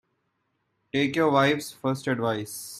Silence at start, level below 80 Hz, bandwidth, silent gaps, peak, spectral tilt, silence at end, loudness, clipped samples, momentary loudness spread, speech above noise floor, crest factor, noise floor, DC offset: 0.95 s; -66 dBFS; 16 kHz; none; -8 dBFS; -5 dB/octave; 0 s; -25 LUFS; under 0.1%; 9 LU; 50 dB; 20 dB; -75 dBFS; under 0.1%